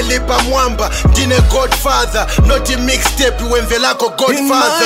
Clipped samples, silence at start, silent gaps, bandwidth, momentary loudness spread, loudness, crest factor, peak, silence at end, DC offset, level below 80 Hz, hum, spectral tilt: under 0.1%; 0 s; none; 16.5 kHz; 3 LU; -12 LUFS; 12 dB; 0 dBFS; 0 s; under 0.1%; -18 dBFS; none; -4 dB/octave